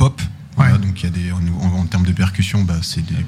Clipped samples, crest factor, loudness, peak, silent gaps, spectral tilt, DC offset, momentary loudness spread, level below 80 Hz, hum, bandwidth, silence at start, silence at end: under 0.1%; 16 dB; -18 LUFS; 0 dBFS; none; -6 dB/octave; under 0.1%; 7 LU; -36 dBFS; none; 14 kHz; 0 s; 0 s